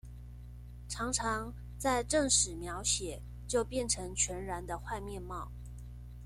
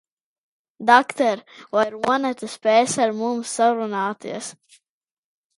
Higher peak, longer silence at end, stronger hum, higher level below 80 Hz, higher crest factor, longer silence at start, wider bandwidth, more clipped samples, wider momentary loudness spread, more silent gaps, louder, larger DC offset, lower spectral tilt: second, -14 dBFS vs 0 dBFS; second, 0 s vs 1.05 s; first, 60 Hz at -45 dBFS vs none; first, -46 dBFS vs -72 dBFS; about the same, 22 dB vs 22 dB; second, 0.05 s vs 0.8 s; first, 15.5 kHz vs 11.5 kHz; neither; first, 21 LU vs 15 LU; neither; second, -33 LUFS vs -21 LUFS; neither; about the same, -2.5 dB/octave vs -3 dB/octave